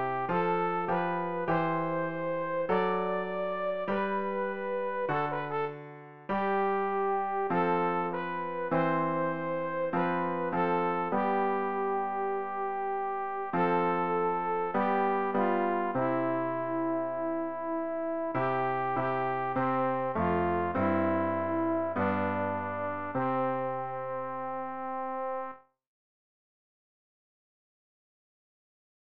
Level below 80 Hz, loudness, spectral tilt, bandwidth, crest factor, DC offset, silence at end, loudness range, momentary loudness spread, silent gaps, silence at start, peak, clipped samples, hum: -66 dBFS; -31 LUFS; -5.5 dB/octave; 5.4 kHz; 14 dB; 0.4%; 3.2 s; 5 LU; 6 LU; none; 0 s; -16 dBFS; under 0.1%; none